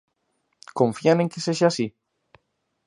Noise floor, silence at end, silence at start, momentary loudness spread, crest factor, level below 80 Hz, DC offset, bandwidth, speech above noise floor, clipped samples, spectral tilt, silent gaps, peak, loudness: -73 dBFS; 0.95 s; 0.75 s; 10 LU; 20 dB; -68 dBFS; under 0.1%; 11 kHz; 52 dB; under 0.1%; -5.5 dB/octave; none; -4 dBFS; -22 LUFS